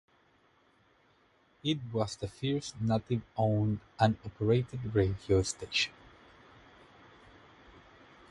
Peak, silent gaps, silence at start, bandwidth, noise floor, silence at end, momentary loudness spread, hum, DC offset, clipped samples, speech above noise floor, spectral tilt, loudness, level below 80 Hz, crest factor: -10 dBFS; none; 1.65 s; 11.5 kHz; -67 dBFS; 2.4 s; 5 LU; none; under 0.1%; under 0.1%; 36 dB; -5.5 dB/octave; -32 LUFS; -54 dBFS; 24 dB